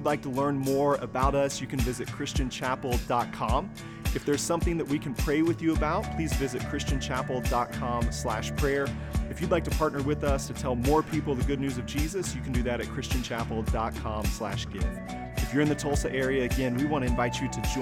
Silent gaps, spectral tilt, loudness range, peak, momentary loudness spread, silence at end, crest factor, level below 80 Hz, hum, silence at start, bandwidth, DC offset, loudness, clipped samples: none; -5.5 dB/octave; 2 LU; -12 dBFS; 6 LU; 0 s; 16 dB; -36 dBFS; none; 0 s; 17 kHz; under 0.1%; -29 LUFS; under 0.1%